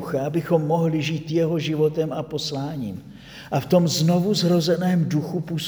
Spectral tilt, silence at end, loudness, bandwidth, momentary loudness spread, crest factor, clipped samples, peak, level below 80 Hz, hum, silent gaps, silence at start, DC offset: -6 dB/octave; 0 s; -22 LUFS; over 20 kHz; 10 LU; 16 dB; under 0.1%; -6 dBFS; -56 dBFS; none; none; 0 s; under 0.1%